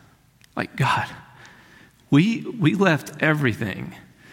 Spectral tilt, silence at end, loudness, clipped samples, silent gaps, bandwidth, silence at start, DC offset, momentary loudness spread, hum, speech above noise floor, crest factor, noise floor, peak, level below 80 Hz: -6.5 dB/octave; 0.3 s; -22 LUFS; under 0.1%; none; 16.5 kHz; 0.55 s; under 0.1%; 15 LU; none; 34 dB; 18 dB; -56 dBFS; -4 dBFS; -58 dBFS